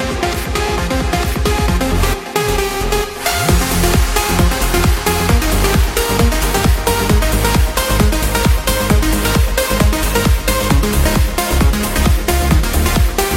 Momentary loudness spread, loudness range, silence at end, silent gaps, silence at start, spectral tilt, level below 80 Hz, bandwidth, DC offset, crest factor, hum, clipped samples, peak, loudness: 3 LU; 1 LU; 0 s; none; 0 s; -4.5 dB/octave; -16 dBFS; 16.5 kHz; under 0.1%; 14 dB; none; under 0.1%; 0 dBFS; -15 LUFS